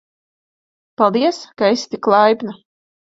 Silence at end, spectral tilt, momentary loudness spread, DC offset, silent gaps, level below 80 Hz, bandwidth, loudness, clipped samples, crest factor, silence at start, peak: 0.6 s; -5 dB/octave; 7 LU; under 0.1%; none; -66 dBFS; 7.8 kHz; -16 LUFS; under 0.1%; 18 dB; 1 s; 0 dBFS